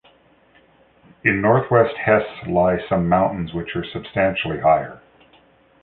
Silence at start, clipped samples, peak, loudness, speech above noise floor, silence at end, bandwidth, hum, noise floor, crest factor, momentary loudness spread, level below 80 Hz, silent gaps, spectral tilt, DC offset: 1.25 s; under 0.1%; -2 dBFS; -19 LUFS; 36 dB; 0.85 s; 4.3 kHz; none; -55 dBFS; 20 dB; 10 LU; -46 dBFS; none; -10.5 dB/octave; under 0.1%